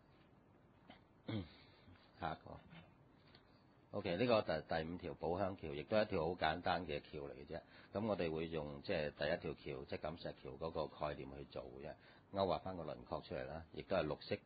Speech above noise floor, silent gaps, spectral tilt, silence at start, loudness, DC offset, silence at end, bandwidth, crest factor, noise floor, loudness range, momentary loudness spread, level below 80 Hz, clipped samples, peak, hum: 26 dB; none; -4.5 dB/octave; 0.9 s; -43 LUFS; under 0.1%; 0.05 s; 4.8 kHz; 24 dB; -68 dBFS; 10 LU; 14 LU; -64 dBFS; under 0.1%; -20 dBFS; none